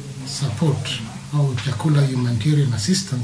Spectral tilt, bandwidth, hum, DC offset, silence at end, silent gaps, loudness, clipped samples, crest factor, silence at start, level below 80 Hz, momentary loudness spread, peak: -5.5 dB/octave; 11 kHz; none; under 0.1%; 0 s; none; -21 LUFS; under 0.1%; 14 dB; 0 s; -52 dBFS; 7 LU; -6 dBFS